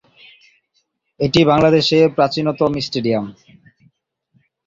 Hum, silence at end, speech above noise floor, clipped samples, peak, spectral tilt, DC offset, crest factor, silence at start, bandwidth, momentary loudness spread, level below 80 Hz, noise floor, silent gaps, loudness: none; 1.35 s; 52 dB; under 0.1%; -2 dBFS; -6 dB/octave; under 0.1%; 16 dB; 1.2 s; 7.8 kHz; 10 LU; -50 dBFS; -67 dBFS; none; -16 LUFS